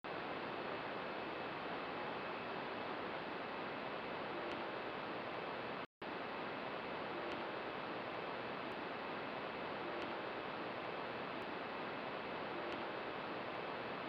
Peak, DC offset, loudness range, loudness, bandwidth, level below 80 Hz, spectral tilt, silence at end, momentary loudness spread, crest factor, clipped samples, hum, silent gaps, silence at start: -32 dBFS; under 0.1%; 0 LU; -44 LUFS; 16 kHz; -76 dBFS; -6 dB/octave; 0 s; 1 LU; 14 dB; under 0.1%; none; 5.86-6.01 s; 0.05 s